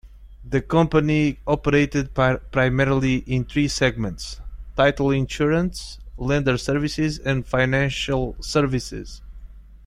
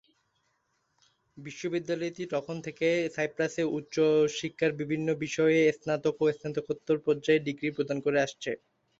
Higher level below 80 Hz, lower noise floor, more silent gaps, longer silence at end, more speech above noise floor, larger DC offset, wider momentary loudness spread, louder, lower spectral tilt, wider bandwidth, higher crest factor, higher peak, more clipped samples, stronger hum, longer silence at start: first, -36 dBFS vs -70 dBFS; second, -41 dBFS vs -75 dBFS; neither; second, 0.1 s vs 0.45 s; second, 20 dB vs 47 dB; neither; first, 13 LU vs 10 LU; first, -22 LUFS vs -29 LUFS; about the same, -6 dB/octave vs -5.5 dB/octave; first, 13 kHz vs 7.8 kHz; about the same, 20 dB vs 16 dB; first, -2 dBFS vs -12 dBFS; neither; neither; second, 0.05 s vs 1.35 s